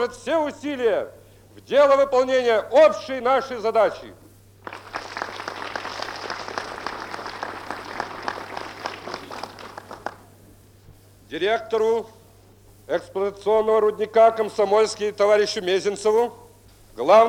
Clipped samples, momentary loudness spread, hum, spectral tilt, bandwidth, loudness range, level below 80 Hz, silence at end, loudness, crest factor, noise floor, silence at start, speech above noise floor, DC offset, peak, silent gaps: under 0.1%; 18 LU; none; -3.5 dB/octave; 16.5 kHz; 13 LU; -58 dBFS; 0 s; -22 LUFS; 18 dB; -51 dBFS; 0 s; 31 dB; under 0.1%; -4 dBFS; none